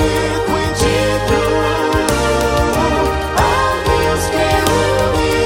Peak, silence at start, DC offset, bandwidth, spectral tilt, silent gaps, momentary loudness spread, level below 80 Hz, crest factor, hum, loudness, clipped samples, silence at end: 0 dBFS; 0 s; under 0.1%; 17 kHz; -4.5 dB/octave; none; 3 LU; -26 dBFS; 14 dB; none; -15 LUFS; under 0.1%; 0 s